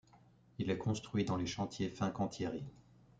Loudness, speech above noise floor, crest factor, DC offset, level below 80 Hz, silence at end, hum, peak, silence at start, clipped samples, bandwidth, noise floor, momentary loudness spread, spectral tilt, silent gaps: -39 LUFS; 27 dB; 18 dB; under 0.1%; -66 dBFS; 0.4 s; none; -20 dBFS; 0.15 s; under 0.1%; 9.2 kHz; -65 dBFS; 8 LU; -6 dB/octave; none